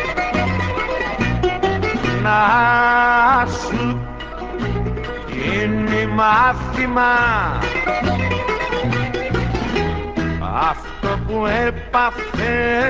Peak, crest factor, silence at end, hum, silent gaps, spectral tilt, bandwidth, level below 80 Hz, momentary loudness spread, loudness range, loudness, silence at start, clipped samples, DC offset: -2 dBFS; 16 dB; 0 s; none; none; -6 dB/octave; 8 kHz; -30 dBFS; 10 LU; 4 LU; -18 LUFS; 0 s; under 0.1%; under 0.1%